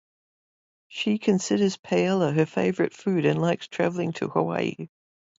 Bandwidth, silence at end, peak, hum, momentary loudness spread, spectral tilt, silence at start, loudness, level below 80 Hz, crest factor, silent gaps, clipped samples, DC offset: 8 kHz; 0.55 s; -8 dBFS; none; 7 LU; -6 dB/octave; 0.9 s; -25 LUFS; -68 dBFS; 18 dB; 1.79-1.83 s; under 0.1%; under 0.1%